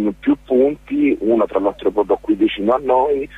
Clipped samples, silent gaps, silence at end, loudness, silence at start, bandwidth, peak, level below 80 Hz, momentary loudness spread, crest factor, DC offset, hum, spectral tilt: under 0.1%; none; 0 s; -17 LUFS; 0 s; 4 kHz; -4 dBFS; -46 dBFS; 3 LU; 12 dB; under 0.1%; none; -7.5 dB/octave